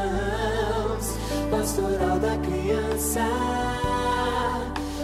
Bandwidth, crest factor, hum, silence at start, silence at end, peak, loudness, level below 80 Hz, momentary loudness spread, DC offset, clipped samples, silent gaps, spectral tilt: 16 kHz; 14 dB; none; 0 s; 0 s; -12 dBFS; -26 LUFS; -34 dBFS; 4 LU; under 0.1%; under 0.1%; none; -4.5 dB/octave